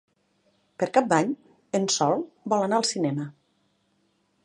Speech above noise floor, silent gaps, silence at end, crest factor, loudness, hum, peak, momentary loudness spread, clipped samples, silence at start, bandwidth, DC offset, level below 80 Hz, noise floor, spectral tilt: 45 dB; none; 1.15 s; 22 dB; -25 LUFS; none; -6 dBFS; 10 LU; under 0.1%; 0.8 s; 11.5 kHz; under 0.1%; -76 dBFS; -69 dBFS; -4 dB/octave